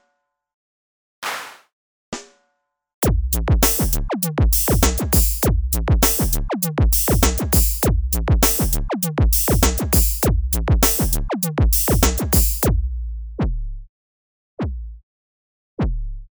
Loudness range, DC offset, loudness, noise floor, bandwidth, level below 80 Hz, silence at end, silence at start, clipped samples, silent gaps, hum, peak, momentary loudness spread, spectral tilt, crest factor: 9 LU; under 0.1%; -18 LUFS; -72 dBFS; over 20 kHz; -22 dBFS; 0.1 s; 1.2 s; under 0.1%; 1.73-2.12 s, 2.94-3.02 s, 13.89-14.57 s, 15.03-15.77 s; none; 0 dBFS; 14 LU; -4.5 dB/octave; 18 dB